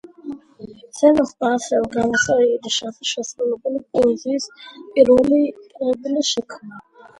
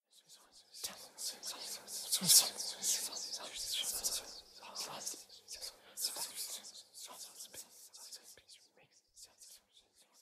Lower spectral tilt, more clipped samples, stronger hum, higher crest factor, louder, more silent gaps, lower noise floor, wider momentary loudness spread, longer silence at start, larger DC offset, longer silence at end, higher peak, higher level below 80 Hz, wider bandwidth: first, -3.5 dB/octave vs 0.5 dB/octave; neither; neither; second, 18 dB vs 30 dB; first, -19 LUFS vs -35 LUFS; neither; second, -40 dBFS vs -70 dBFS; about the same, 20 LU vs 18 LU; about the same, 0.25 s vs 0.15 s; neither; about the same, 0.4 s vs 0.4 s; first, 0 dBFS vs -10 dBFS; first, -54 dBFS vs -78 dBFS; second, 11.5 kHz vs 15.5 kHz